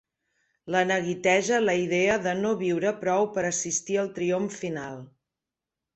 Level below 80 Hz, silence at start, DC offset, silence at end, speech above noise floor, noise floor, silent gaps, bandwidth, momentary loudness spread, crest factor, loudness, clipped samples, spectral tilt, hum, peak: -64 dBFS; 0.65 s; under 0.1%; 0.9 s; 62 dB; -88 dBFS; none; 8.4 kHz; 9 LU; 18 dB; -26 LUFS; under 0.1%; -4 dB/octave; none; -8 dBFS